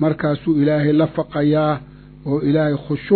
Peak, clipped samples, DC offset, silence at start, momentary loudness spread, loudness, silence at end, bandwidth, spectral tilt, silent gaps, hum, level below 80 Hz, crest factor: -2 dBFS; under 0.1%; under 0.1%; 0 s; 8 LU; -18 LUFS; 0 s; 4.5 kHz; -11.5 dB/octave; none; none; -48 dBFS; 16 dB